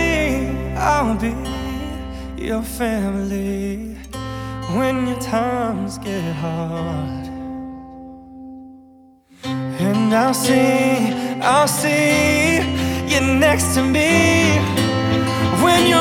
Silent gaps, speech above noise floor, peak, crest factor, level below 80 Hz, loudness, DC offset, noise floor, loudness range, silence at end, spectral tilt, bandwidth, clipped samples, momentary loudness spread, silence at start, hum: none; 31 dB; -2 dBFS; 16 dB; -36 dBFS; -18 LUFS; under 0.1%; -48 dBFS; 11 LU; 0 s; -4.5 dB/octave; 18.5 kHz; under 0.1%; 15 LU; 0 s; none